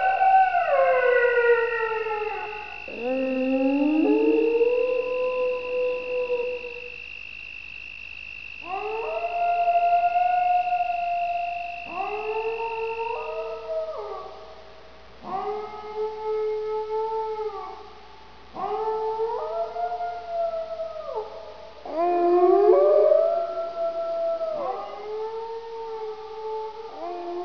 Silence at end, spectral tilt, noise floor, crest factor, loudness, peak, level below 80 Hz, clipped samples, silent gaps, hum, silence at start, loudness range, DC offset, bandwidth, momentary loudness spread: 0 s; -6 dB/octave; -48 dBFS; 18 dB; -25 LUFS; -6 dBFS; -58 dBFS; under 0.1%; none; none; 0 s; 10 LU; 0.4%; 5.4 kHz; 16 LU